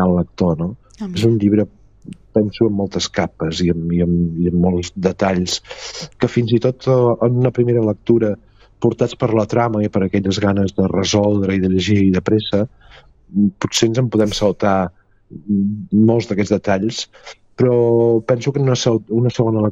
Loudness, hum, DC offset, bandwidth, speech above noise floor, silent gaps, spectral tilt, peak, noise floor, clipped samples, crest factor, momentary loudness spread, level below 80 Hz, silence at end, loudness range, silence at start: -17 LUFS; none; under 0.1%; 9.2 kHz; 22 dB; none; -6.5 dB/octave; -2 dBFS; -38 dBFS; under 0.1%; 16 dB; 7 LU; -44 dBFS; 0 s; 2 LU; 0 s